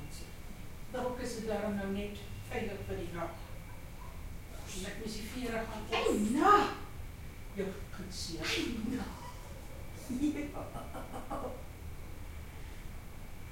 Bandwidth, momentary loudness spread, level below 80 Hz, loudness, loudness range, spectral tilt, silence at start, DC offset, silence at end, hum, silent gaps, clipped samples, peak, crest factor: 16.5 kHz; 17 LU; -48 dBFS; -36 LUFS; 9 LU; -5 dB/octave; 0 s; under 0.1%; 0 s; none; none; under 0.1%; -14 dBFS; 24 dB